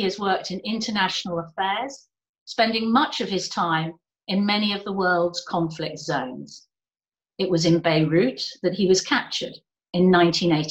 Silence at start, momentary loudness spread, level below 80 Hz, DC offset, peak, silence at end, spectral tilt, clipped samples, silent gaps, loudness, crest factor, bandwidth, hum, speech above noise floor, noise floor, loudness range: 0 s; 11 LU; -60 dBFS; under 0.1%; -6 dBFS; 0 s; -5 dB/octave; under 0.1%; 2.29-2.34 s, 2.41-2.46 s; -23 LUFS; 18 dB; 17 kHz; none; over 67 dB; under -90 dBFS; 4 LU